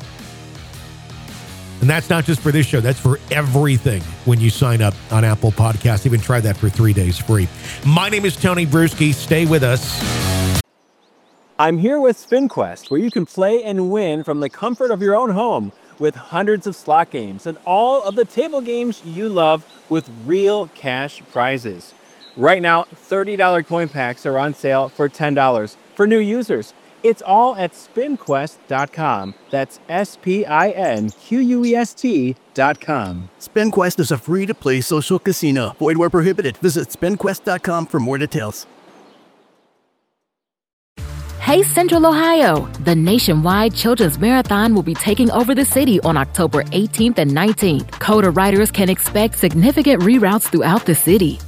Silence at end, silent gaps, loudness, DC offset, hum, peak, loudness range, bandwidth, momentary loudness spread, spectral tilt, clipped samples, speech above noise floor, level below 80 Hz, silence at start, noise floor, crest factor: 0 s; 40.73-40.96 s; -17 LUFS; under 0.1%; none; 0 dBFS; 5 LU; 17.5 kHz; 10 LU; -5.5 dB/octave; under 0.1%; 66 dB; -40 dBFS; 0 s; -82 dBFS; 16 dB